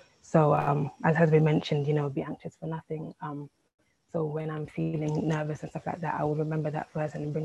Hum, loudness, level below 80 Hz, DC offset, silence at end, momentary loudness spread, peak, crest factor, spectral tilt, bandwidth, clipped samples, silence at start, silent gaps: none; -29 LUFS; -62 dBFS; under 0.1%; 0 s; 15 LU; -8 dBFS; 20 dB; -8 dB/octave; 8.2 kHz; under 0.1%; 0.3 s; 3.74-3.78 s